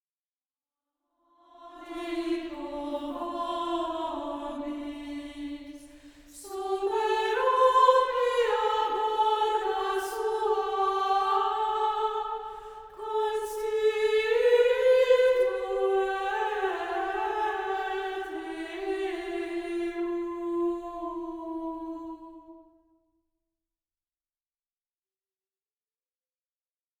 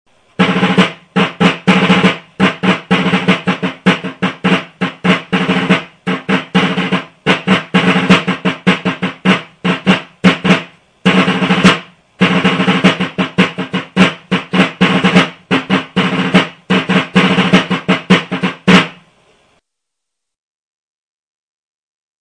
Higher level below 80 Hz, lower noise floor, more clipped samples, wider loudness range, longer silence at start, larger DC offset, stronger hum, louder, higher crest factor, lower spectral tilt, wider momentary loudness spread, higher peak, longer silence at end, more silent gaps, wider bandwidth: second, -60 dBFS vs -48 dBFS; first, under -90 dBFS vs -78 dBFS; second, under 0.1% vs 0.6%; first, 11 LU vs 3 LU; first, 1.6 s vs 0.4 s; neither; neither; second, -28 LUFS vs -13 LUFS; first, 20 dB vs 14 dB; second, -3 dB/octave vs -6 dB/octave; first, 16 LU vs 7 LU; second, -8 dBFS vs 0 dBFS; first, 4.4 s vs 3.3 s; neither; first, 19 kHz vs 10 kHz